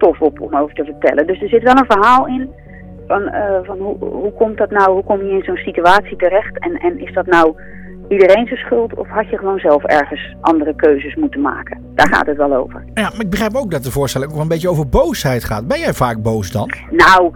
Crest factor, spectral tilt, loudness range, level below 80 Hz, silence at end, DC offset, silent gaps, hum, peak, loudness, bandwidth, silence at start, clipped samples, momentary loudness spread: 14 dB; -5.5 dB/octave; 3 LU; -34 dBFS; 0 s; under 0.1%; none; none; 0 dBFS; -14 LUFS; 19 kHz; 0 s; under 0.1%; 10 LU